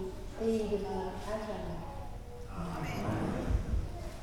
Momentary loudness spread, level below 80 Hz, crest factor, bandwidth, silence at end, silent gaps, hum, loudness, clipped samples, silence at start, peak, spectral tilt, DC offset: 11 LU; -42 dBFS; 16 dB; 18 kHz; 0 s; none; none; -37 LUFS; under 0.1%; 0 s; -20 dBFS; -7 dB/octave; under 0.1%